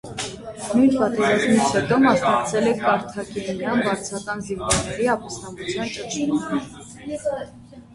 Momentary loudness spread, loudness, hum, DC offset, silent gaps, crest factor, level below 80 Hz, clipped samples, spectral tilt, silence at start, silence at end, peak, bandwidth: 14 LU; -22 LUFS; none; under 0.1%; none; 18 dB; -48 dBFS; under 0.1%; -4.5 dB/octave; 0.05 s; 0 s; -4 dBFS; 11.5 kHz